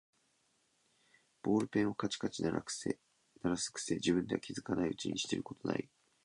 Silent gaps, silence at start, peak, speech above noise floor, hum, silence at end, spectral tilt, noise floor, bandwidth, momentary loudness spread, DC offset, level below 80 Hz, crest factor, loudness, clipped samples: none; 1.45 s; -18 dBFS; 40 dB; none; 0.4 s; -4.5 dB/octave; -76 dBFS; 11 kHz; 7 LU; under 0.1%; -66 dBFS; 20 dB; -37 LUFS; under 0.1%